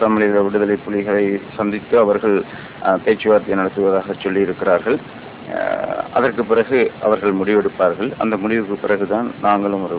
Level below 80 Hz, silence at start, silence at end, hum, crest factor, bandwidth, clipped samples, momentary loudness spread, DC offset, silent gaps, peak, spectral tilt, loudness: -52 dBFS; 0 s; 0 s; none; 16 dB; 4 kHz; under 0.1%; 7 LU; under 0.1%; none; -2 dBFS; -10.5 dB/octave; -18 LUFS